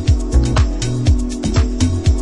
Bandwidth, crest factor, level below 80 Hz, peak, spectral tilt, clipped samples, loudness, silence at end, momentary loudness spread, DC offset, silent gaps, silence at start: 11 kHz; 12 dB; -18 dBFS; -2 dBFS; -6 dB/octave; under 0.1%; -17 LUFS; 0 s; 3 LU; under 0.1%; none; 0 s